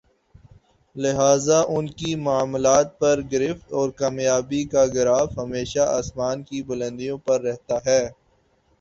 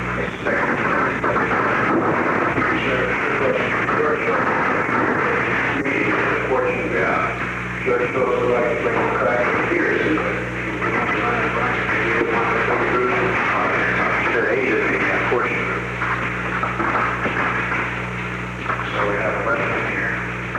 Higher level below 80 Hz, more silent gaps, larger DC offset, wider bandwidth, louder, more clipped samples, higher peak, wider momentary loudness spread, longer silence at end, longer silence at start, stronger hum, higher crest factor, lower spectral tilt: second, -50 dBFS vs -42 dBFS; neither; neither; second, 8 kHz vs 12 kHz; second, -22 LUFS vs -19 LUFS; neither; about the same, -4 dBFS vs -6 dBFS; first, 10 LU vs 4 LU; first, 0.65 s vs 0 s; first, 0.95 s vs 0 s; second, none vs 60 Hz at -35 dBFS; about the same, 18 dB vs 14 dB; second, -4.5 dB/octave vs -6 dB/octave